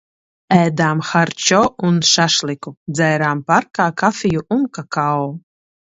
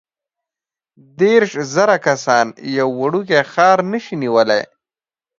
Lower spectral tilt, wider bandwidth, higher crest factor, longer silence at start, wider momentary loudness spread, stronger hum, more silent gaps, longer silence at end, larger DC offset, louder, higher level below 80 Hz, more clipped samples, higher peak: about the same, -4 dB/octave vs -4.5 dB/octave; about the same, 8 kHz vs 7.6 kHz; about the same, 16 dB vs 16 dB; second, 0.5 s vs 1.2 s; about the same, 8 LU vs 7 LU; neither; first, 2.77-2.86 s vs none; second, 0.55 s vs 0.75 s; neither; about the same, -16 LUFS vs -15 LUFS; first, -54 dBFS vs -66 dBFS; neither; about the same, 0 dBFS vs 0 dBFS